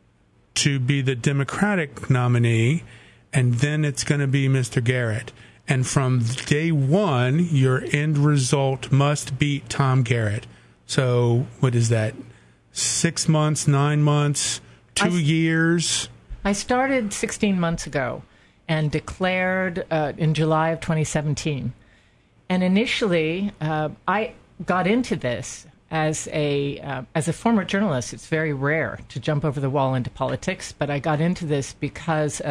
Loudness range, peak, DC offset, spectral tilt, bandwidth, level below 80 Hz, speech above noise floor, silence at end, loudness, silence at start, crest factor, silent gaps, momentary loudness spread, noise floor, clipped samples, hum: 4 LU; -2 dBFS; under 0.1%; -5.5 dB/octave; 12 kHz; -50 dBFS; 37 dB; 0 s; -22 LUFS; 0.55 s; 22 dB; none; 8 LU; -59 dBFS; under 0.1%; none